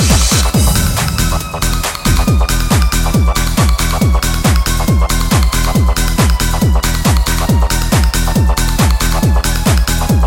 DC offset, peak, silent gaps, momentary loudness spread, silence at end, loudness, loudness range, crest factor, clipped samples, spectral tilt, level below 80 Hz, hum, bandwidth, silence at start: under 0.1%; 0 dBFS; none; 2 LU; 0 s; -13 LUFS; 1 LU; 10 dB; under 0.1%; -4.5 dB/octave; -14 dBFS; none; 17 kHz; 0 s